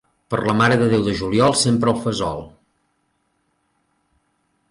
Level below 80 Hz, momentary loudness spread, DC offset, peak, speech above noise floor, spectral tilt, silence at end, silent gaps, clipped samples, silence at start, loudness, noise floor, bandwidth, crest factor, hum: -48 dBFS; 10 LU; under 0.1%; -4 dBFS; 50 dB; -5 dB/octave; 2.2 s; none; under 0.1%; 0.3 s; -18 LUFS; -68 dBFS; 11.5 kHz; 18 dB; none